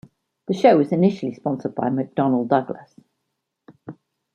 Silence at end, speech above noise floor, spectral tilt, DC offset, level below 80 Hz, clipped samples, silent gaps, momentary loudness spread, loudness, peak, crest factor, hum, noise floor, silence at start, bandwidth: 0.4 s; 58 dB; -8.5 dB/octave; under 0.1%; -68 dBFS; under 0.1%; none; 24 LU; -20 LUFS; -2 dBFS; 20 dB; none; -78 dBFS; 0.5 s; 9 kHz